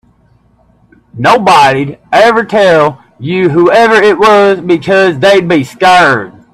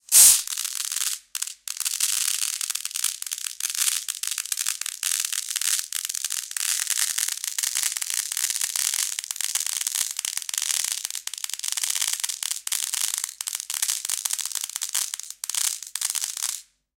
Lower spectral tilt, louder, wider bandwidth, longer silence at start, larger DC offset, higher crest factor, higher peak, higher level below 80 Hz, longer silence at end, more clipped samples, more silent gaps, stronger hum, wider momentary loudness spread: first, -5 dB/octave vs 5 dB/octave; first, -7 LUFS vs -24 LUFS; second, 14 kHz vs 17 kHz; first, 1.15 s vs 0.1 s; neither; second, 8 dB vs 26 dB; about the same, 0 dBFS vs 0 dBFS; first, -46 dBFS vs -72 dBFS; about the same, 0.25 s vs 0.35 s; first, 0.3% vs under 0.1%; neither; neither; about the same, 7 LU vs 6 LU